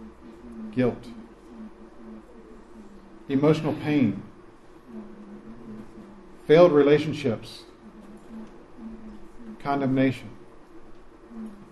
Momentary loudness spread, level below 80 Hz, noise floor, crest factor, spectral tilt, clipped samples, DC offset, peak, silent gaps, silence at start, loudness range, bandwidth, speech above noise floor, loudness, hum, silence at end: 26 LU; -56 dBFS; -48 dBFS; 22 dB; -7.5 dB/octave; under 0.1%; under 0.1%; -4 dBFS; none; 0 s; 7 LU; 12 kHz; 27 dB; -23 LUFS; none; 0.1 s